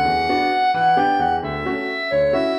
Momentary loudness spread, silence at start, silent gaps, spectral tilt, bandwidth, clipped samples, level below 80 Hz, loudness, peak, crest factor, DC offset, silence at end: 7 LU; 0 s; none; -6 dB/octave; 11 kHz; under 0.1%; -44 dBFS; -19 LUFS; -6 dBFS; 12 dB; under 0.1%; 0 s